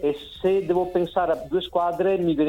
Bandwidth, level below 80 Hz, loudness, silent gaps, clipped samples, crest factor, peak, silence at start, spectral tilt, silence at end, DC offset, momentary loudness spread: 16 kHz; -50 dBFS; -24 LUFS; none; under 0.1%; 14 dB; -10 dBFS; 0 s; -7.5 dB/octave; 0 s; under 0.1%; 4 LU